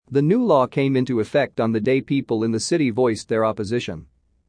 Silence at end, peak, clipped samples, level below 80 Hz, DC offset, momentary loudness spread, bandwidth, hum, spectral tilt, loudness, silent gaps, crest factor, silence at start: 0.45 s; -4 dBFS; under 0.1%; -58 dBFS; under 0.1%; 7 LU; 10.5 kHz; none; -6 dB/octave; -21 LUFS; none; 16 dB; 0.1 s